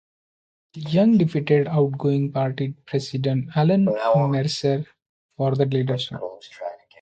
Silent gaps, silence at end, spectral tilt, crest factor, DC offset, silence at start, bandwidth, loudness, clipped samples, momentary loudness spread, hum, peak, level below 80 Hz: 5.09-5.29 s; 0.25 s; -7.5 dB/octave; 16 dB; under 0.1%; 0.75 s; 8.8 kHz; -22 LUFS; under 0.1%; 16 LU; none; -6 dBFS; -62 dBFS